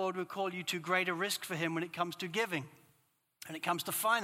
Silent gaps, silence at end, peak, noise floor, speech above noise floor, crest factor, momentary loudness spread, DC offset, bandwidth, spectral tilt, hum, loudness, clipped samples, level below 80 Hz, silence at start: none; 0 s; -16 dBFS; -75 dBFS; 39 dB; 20 dB; 8 LU; under 0.1%; 16.5 kHz; -3.5 dB/octave; none; -35 LUFS; under 0.1%; -86 dBFS; 0 s